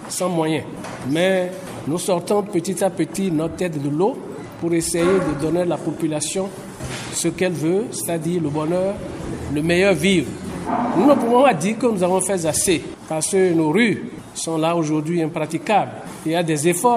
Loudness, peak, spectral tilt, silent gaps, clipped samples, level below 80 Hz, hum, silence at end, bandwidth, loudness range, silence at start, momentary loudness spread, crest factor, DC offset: -20 LUFS; -2 dBFS; -5 dB/octave; none; under 0.1%; -48 dBFS; none; 0 s; 14.5 kHz; 5 LU; 0 s; 11 LU; 18 dB; under 0.1%